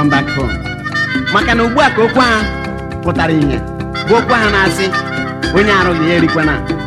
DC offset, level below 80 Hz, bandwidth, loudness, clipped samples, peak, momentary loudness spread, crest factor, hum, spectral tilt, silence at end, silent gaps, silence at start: under 0.1%; -28 dBFS; 14 kHz; -13 LUFS; under 0.1%; 0 dBFS; 9 LU; 12 dB; none; -5.5 dB/octave; 0 s; none; 0 s